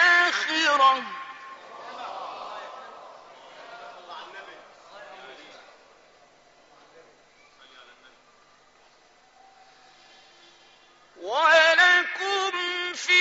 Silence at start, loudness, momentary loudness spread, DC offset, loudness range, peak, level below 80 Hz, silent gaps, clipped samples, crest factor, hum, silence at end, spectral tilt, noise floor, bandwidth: 0 s; -21 LUFS; 27 LU; under 0.1%; 26 LU; -6 dBFS; -76 dBFS; none; under 0.1%; 22 dB; none; 0 s; 3.5 dB/octave; -58 dBFS; 8 kHz